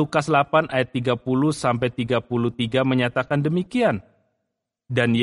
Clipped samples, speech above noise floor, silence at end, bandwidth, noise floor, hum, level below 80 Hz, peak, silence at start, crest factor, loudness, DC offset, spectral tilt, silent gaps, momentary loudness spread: under 0.1%; 59 dB; 0 s; 11.5 kHz; -80 dBFS; none; -56 dBFS; -4 dBFS; 0 s; 18 dB; -22 LUFS; under 0.1%; -6.5 dB/octave; none; 4 LU